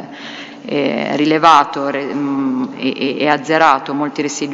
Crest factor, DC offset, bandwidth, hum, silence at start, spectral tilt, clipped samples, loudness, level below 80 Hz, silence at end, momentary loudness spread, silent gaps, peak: 16 dB; under 0.1%; 8.6 kHz; none; 0 s; -4.5 dB/octave; 0.2%; -15 LUFS; -62 dBFS; 0 s; 12 LU; none; 0 dBFS